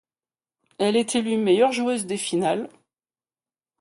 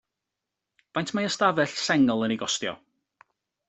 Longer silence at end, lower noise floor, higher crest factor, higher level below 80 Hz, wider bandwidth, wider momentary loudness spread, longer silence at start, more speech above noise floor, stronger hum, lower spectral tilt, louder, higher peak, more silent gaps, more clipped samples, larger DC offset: first, 1.15 s vs 0.95 s; first, under -90 dBFS vs -86 dBFS; about the same, 18 dB vs 22 dB; about the same, -70 dBFS vs -68 dBFS; first, 11.5 kHz vs 8.4 kHz; second, 7 LU vs 11 LU; second, 0.8 s vs 0.95 s; first, over 68 dB vs 61 dB; neither; about the same, -4 dB/octave vs -4 dB/octave; about the same, -23 LUFS vs -25 LUFS; about the same, -8 dBFS vs -6 dBFS; neither; neither; neither